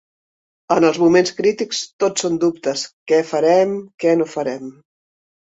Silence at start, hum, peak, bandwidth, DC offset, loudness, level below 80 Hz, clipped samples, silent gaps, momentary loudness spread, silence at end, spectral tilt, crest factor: 0.7 s; none; -2 dBFS; 8.2 kHz; under 0.1%; -18 LUFS; -62 dBFS; under 0.1%; 1.93-1.99 s, 2.93-3.06 s, 3.94-3.98 s; 10 LU; 0.7 s; -4.5 dB/octave; 16 dB